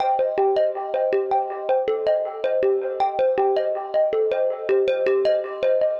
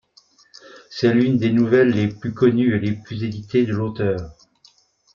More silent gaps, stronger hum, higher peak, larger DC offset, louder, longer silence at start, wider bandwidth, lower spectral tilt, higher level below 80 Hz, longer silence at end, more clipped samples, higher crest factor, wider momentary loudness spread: neither; neither; second, -10 dBFS vs -4 dBFS; neither; second, -22 LUFS vs -19 LUFS; second, 0 s vs 0.75 s; about the same, 6.6 kHz vs 7 kHz; second, -6 dB/octave vs -8 dB/octave; second, -64 dBFS vs -54 dBFS; second, 0 s vs 0.85 s; neither; second, 10 dB vs 16 dB; second, 4 LU vs 12 LU